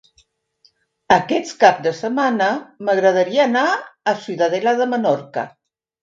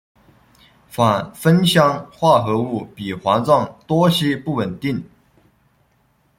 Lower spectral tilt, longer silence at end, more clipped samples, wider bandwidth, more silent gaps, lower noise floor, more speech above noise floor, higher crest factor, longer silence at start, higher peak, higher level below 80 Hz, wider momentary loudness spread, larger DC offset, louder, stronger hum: second, -4.5 dB/octave vs -6 dB/octave; second, 0.55 s vs 1.35 s; neither; second, 7.6 kHz vs 16.5 kHz; neither; about the same, -60 dBFS vs -61 dBFS; about the same, 43 dB vs 43 dB; about the same, 18 dB vs 18 dB; first, 1.1 s vs 0.95 s; about the same, 0 dBFS vs -2 dBFS; second, -62 dBFS vs -54 dBFS; second, 8 LU vs 11 LU; neither; about the same, -18 LUFS vs -18 LUFS; neither